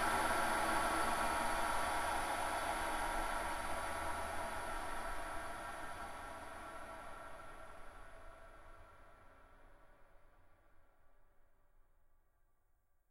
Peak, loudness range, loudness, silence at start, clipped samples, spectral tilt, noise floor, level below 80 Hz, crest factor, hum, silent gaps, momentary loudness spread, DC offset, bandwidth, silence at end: -24 dBFS; 21 LU; -40 LUFS; 0 s; under 0.1%; -2.5 dB/octave; -74 dBFS; -52 dBFS; 18 dB; none; none; 22 LU; under 0.1%; 16 kHz; 1.3 s